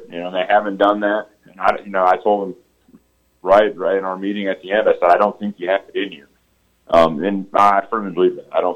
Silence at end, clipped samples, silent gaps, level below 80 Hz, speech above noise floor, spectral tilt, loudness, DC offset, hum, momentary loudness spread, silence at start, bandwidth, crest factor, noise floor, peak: 0 s; under 0.1%; none; -54 dBFS; 44 dB; -6.5 dB/octave; -17 LUFS; under 0.1%; none; 10 LU; 0 s; 10 kHz; 16 dB; -61 dBFS; -2 dBFS